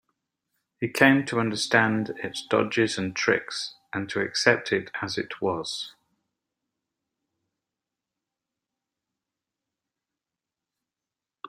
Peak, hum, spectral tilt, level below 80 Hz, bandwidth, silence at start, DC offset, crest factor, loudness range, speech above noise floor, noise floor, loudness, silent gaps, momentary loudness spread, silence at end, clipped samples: -2 dBFS; none; -4 dB/octave; -68 dBFS; 16 kHz; 0.8 s; under 0.1%; 28 dB; 12 LU; 64 dB; -89 dBFS; -25 LUFS; none; 13 LU; 0 s; under 0.1%